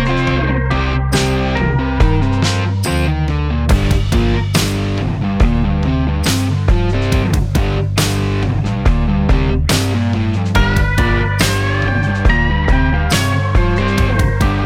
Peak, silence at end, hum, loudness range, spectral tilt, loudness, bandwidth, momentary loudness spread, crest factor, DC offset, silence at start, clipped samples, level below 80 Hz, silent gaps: -2 dBFS; 0 s; none; 1 LU; -5.5 dB/octave; -15 LUFS; 16.5 kHz; 3 LU; 12 dB; under 0.1%; 0 s; under 0.1%; -18 dBFS; none